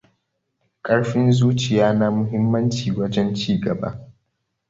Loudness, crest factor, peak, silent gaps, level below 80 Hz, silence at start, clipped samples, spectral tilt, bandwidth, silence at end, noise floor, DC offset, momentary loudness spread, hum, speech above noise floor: -20 LUFS; 18 dB; -4 dBFS; none; -52 dBFS; 0.85 s; under 0.1%; -7 dB/octave; 7.8 kHz; 0.6 s; -74 dBFS; under 0.1%; 9 LU; none; 55 dB